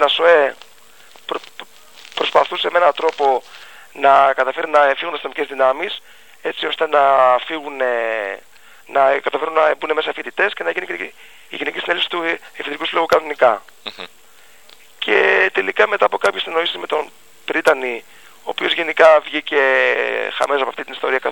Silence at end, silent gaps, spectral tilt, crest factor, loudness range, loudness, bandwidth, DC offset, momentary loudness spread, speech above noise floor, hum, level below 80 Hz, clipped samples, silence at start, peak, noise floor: 0 s; none; -2.5 dB/octave; 18 dB; 4 LU; -17 LUFS; 17.5 kHz; 0.5%; 16 LU; 32 dB; none; -64 dBFS; under 0.1%; 0 s; 0 dBFS; -49 dBFS